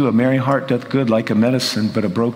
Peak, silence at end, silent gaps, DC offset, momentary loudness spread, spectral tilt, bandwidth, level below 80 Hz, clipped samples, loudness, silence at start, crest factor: -2 dBFS; 0 s; none; under 0.1%; 3 LU; -6 dB/octave; 16 kHz; -60 dBFS; under 0.1%; -17 LUFS; 0 s; 14 dB